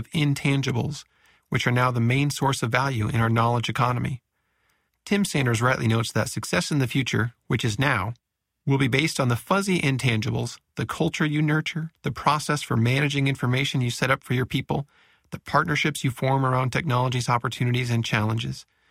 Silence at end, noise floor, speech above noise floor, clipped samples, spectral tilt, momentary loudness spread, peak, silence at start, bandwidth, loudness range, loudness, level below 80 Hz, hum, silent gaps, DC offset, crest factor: 0.3 s; -70 dBFS; 47 dB; under 0.1%; -5.5 dB/octave; 9 LU; -4 dBFS; 0 s; 15.5 kHz; 1 LU; -24 LUFS; -52 dBFS; none; none; under 0.1%; 20 dB